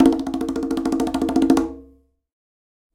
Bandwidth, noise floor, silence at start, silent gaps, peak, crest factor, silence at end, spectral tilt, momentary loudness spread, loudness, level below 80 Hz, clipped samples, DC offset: 16 kHz; -53 dBFS; 0 s; none; -2 dBFS; 20 dB; 1.1 s; -6 dB/octave; 9 LU; -21 LUFS; -44 dBFS; under 0.1%; under 0.1%